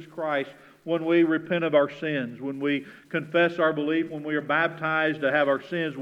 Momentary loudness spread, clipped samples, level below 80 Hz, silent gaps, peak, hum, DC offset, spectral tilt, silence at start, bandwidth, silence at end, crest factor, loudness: 8 LU; under 0.1%; -76 dBFS; none; -8 dBFS; none; under 0.1%; -7.5 dB/octave; 0 s; 6.8 kHz; 0 s; 18 dB; -25 LUFS